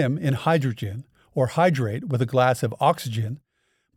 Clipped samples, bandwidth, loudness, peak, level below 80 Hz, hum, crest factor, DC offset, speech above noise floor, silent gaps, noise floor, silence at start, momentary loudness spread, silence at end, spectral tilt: under 0.1%; 15.5 kHz; -23 LUFS; -6 dBFS; -62 dBFS; none; 16 dB; under 0.1%; 48 dB; none; -70 dBFS; 0 s; 12 LU; 0.6 s; -6.5 dB/octave